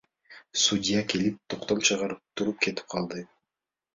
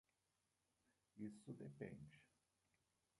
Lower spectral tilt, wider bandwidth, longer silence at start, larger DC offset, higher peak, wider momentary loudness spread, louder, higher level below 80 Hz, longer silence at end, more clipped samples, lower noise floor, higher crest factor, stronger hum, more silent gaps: second, -3 dB/octave vs -7.5 dB/octave; second, 7.8 kHz vs 11 kHz; second, 0.3 s vs 1.15 s; neither; first, -8 dBFS vs -38 dBFS; first, 10 LU vs 6 LU; first, -27 LUFS vs -57 LUFS; first, -62 dBFS vs -84 dBFS; second, 0.7 s vs 0.95 s; neither; about the same, -88 dBFS vs -89 dBFS; about the same, 22 dB vs 22 dB; neither; neither